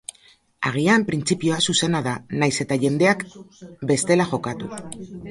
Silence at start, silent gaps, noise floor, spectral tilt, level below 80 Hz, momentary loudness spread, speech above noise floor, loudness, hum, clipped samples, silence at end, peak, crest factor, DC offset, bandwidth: 0.6 s; none; -56 dBFS; -4.5 dB/octave; -56 dBFS; 16 LU; 34 dB; -21 LUFS; none; under 0.1%; 0 s; -2 dBFS; 20 dB; under 0.1%; 11.5 kHz